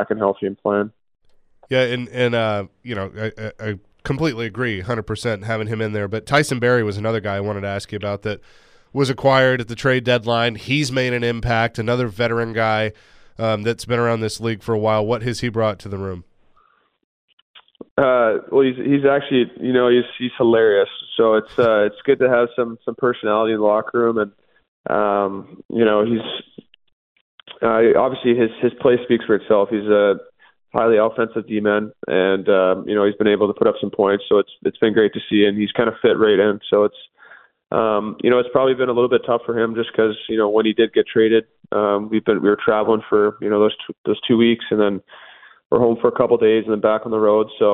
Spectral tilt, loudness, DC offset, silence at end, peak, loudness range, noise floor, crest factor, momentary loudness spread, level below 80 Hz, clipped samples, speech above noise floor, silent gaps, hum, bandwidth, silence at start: -6.5 dB/octave; -18 LUFS; under 0.1%; 0 s; -2 dBFS; 5 LU; -59 dBFS; 16 dB; 9 LU; -52 dBFS; under 0.1%; 41 dB; 17.04-17.54 s, 17.91-17.96 s, 24.68-24.84 s, 25.65-25.69 s, 26.93-27.38 s, 43.98-44.04 s, 45.66-45.70 s; none; 11 kHz; 0 s